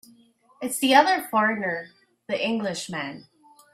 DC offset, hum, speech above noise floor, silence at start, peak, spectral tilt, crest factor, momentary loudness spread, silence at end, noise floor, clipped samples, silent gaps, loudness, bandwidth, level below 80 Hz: under 0.1%; none; 34 dB; 0.6 s; -2 dBFS; -3 dB/octave; 24 dB; 16 LU; 0.5 s; -58 dBFS; under 0.1%; none; -23 LUFS; 16 kHz; -72 dBFS